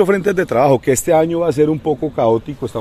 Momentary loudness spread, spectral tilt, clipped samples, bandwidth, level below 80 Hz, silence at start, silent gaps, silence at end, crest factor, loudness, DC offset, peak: 6 LU; -6 dB/octave; under 0.1%; 14.5 kHz; -46 dBFS; 0 s; none; 0 s; 14 dB; -15 LUFS; under 0.1%; -2 dBFS